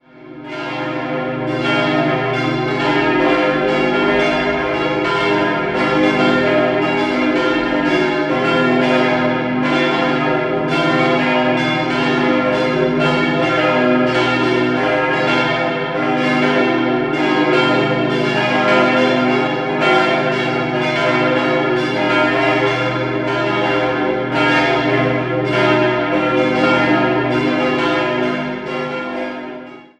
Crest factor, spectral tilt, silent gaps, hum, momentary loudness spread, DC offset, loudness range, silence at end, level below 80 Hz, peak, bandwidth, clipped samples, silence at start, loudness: 14 dB; -6 dB/octave; none; none; 5 LU; under 0.1%; 1 LU; 0.15 s; -48 dBFS; -2 dBFS; 10 kHz; under 0.1%; 0.15 s; -16 LUFS